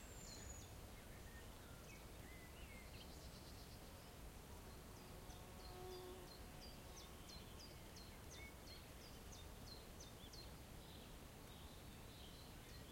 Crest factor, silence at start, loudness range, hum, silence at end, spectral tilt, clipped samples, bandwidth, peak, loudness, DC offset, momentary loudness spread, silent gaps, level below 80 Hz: 14 dB; 0 s; 1 LU; none; 0 s; -4 dB/octave; under 0.1%; 16.5 kHz; -44 dBFS; -58 LUFS; under 0.1%; 3 LU; none; -62 dBFS